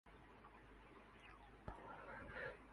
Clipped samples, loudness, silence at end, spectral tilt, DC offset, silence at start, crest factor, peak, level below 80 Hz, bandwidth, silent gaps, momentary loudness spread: under 0.1%; -57 LUFS; 0 s; -6 dB/octave; under 0.1%; 0.05 s; 24 dB; -34 dBFS; -66 dBFS; 11 kHz; none; 12 LU